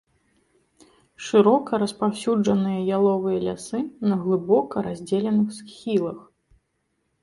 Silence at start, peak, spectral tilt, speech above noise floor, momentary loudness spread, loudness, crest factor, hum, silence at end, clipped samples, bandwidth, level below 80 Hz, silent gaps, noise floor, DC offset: 1.2 s; -6 dBFS; -7 dB/octave; 51 dB; 10 LU; -23 LUFS; 18 dB; none; 1 s; under 0.1%; 11.5 kHz; -62 dBFS; none; -73 dBFS; under 0.1%